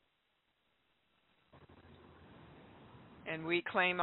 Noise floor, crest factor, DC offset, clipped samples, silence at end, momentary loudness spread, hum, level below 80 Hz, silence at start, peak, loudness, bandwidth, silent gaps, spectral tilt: -80 dBFS; 24 dB; under 0.1%; under 0.1%; 0 s; 27 LU; none; -76 dBFS; 1.55 s; -16 dBFS; -36 LUFS; 4.2 kHz; none; -2 dB/octave